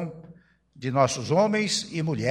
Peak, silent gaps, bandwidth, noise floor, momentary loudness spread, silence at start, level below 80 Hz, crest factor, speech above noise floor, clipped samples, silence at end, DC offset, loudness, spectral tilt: -6 dBFS; none; 15 kHz; -53 dBFS; 10 LU; 0 s; -62 dBFS; 20 dB; 29 dB; under 0.1%; 0 s; under 0.1%; -25 LUFS; -4.5 dB/octave